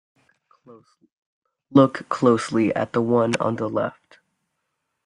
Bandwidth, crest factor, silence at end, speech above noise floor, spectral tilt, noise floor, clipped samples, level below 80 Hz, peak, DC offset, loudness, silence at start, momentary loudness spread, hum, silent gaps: 11 kHz; 22 dB; 1.15 s; 56 dB; -6.5 dB/octave; -77 dBFS; under 0.1%; -64 dBFS; -2 dBFS; under 0.1%; -21 LUFS; 0.7 s; 7 LU; none; 1.12-1.42 s